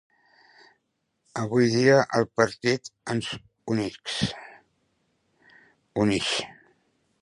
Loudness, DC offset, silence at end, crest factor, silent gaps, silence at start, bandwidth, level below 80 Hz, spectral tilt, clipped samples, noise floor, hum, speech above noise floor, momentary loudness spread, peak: -25 LUFS; under 0.1%; 0.7 s; 22 dB; none; 1.35 s; 11.5 kHz; -58 dBFS; -5 dB/octave; under 0.1%; -76 dBFS; none; 52 dB; 15 LU; -4 dBFS